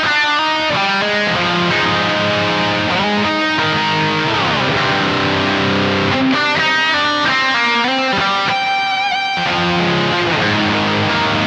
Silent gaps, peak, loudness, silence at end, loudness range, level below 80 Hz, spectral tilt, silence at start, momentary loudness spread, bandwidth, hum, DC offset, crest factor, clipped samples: none; -4 dBFS; -14 LUFS; 0 s; 1 LU; -48 dBFS; -4.5 dB/octave; 0 s; 2 LU; 9.4 kHz; none; under 0.1%; 12 dB; under 0.1%